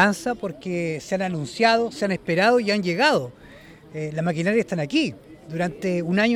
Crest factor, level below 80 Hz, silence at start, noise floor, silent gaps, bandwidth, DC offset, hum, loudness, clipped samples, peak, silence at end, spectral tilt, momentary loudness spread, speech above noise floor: 20 dB; -58 dBFS; 0 s; -46 dBFS; none; 14.5 kHz; under 0.1%; none; -23 LUFS; under 0.1%; -4 dBFS; 0 s; -5.5 dB/octave; 10 LU; 23 dB